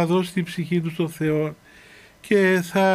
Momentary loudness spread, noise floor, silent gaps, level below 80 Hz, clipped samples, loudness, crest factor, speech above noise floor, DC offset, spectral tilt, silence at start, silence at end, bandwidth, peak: 8 LU; -49 dBFS; none; -60 dBFS; under 0.1%; -22 LUFS; 16 dB; 28 dB; under 0.1%; -6.5 dB/octave; 0 s; 0 s; 15.5 kHz; -6 dBFS